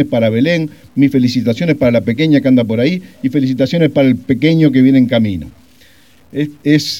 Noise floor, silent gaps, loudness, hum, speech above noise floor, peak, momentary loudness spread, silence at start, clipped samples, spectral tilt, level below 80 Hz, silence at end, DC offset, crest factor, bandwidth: -47 dBFS; none; -13 LUFS; none; 35 dB; 0 dBFS; 9 LU; 0 s; under 0.1%; -7 dB/octave; -50 dBFS; 0 s; 0.4%; 12 dB; 15.5 kHz